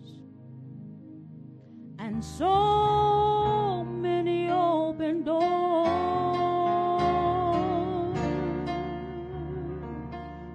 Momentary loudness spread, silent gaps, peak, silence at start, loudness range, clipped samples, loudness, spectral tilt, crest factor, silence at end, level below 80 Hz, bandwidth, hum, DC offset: 23 LU; none; -14 dBFS; 0 s; 4 LU; under 0.1%; -27 LUFS; -7.5 dB/octave; 14 dB; 0 s; -48 dBFS; 9.4 kHz; none; under 0.1%